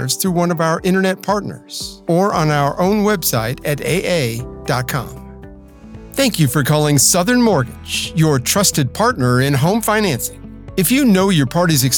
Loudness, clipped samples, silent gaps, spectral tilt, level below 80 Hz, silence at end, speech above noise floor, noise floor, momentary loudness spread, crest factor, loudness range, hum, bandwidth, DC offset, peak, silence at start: -16 LUFS; under 0.1%; none; -4.5 dB/octave; -40 dBFS; 0 s; 22 dB; -37 dBFS; 11 LU; 16 dB; 5 LU; none; 19 kHz; under 0.1%; 0 dBFS; 0 s